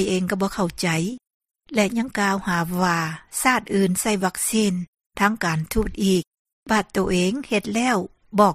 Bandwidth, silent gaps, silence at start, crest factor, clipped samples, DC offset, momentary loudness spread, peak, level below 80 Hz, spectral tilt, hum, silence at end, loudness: 15 kHz; 1.34-1.40 s, 4.88-4.93 s, 6.27-6.31 s, 6.39-6.45 s, 6.52-6.63 s; 0 s; 20 dB; under 0.1%; under 0.1%; 5 LU; -4 dBFS; -44 dBFS; -4.5 dB/octave; none; 0 s; -22 LUFS